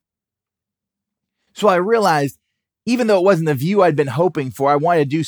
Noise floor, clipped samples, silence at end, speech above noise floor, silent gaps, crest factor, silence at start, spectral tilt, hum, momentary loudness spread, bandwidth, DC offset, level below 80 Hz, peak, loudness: -87 dBFS; under 0.1%; 0 s; 71 dB; none; 16 dB; 1.55 s; -6.5 dB/octave; none; 5 LU; over 20 kHz; under 0.1%; -68 dBFS; -2 dBFS; -16 LUFS